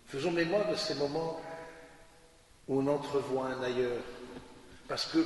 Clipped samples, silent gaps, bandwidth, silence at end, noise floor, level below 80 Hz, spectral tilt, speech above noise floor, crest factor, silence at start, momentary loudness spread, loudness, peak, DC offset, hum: under 0.1%; none; 11.5 kHz; 0 s; -60 dBFS; -62 dBFS; -5 dB/octave; 27 dB; 16 dB; 0.05 s; 20 LU; -33 LUFS; -18 dBFS; under 0.1%; none